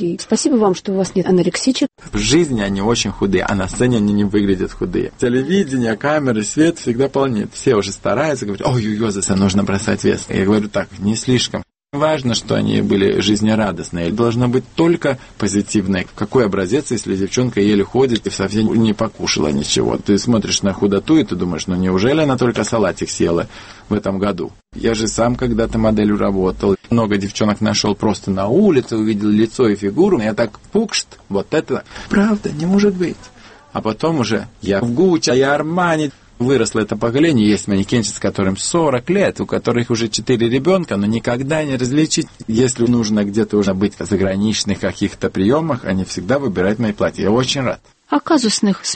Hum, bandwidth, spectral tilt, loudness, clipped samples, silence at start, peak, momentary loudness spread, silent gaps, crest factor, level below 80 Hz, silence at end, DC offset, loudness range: none; 8.8 kHz; -5 dB/octave; -17 LUFS; under 0.1%; 0 s; -2 dBFS; 6 LU; none; 14 dB; -40 dBFS; 0 s; under 0.1%; 2 LU